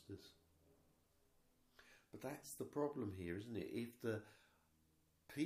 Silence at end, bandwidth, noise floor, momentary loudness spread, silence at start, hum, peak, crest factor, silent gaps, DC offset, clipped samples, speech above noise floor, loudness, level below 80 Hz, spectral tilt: 0 s; 15.5 kHz; -78 dBFS; 21 LU; 0 s; none; -30 dBFS; 20 dB; none; under 0.1%; under 0.1%; 31 dB; -48 LUFS; -78 dBFS; -6 dB/octave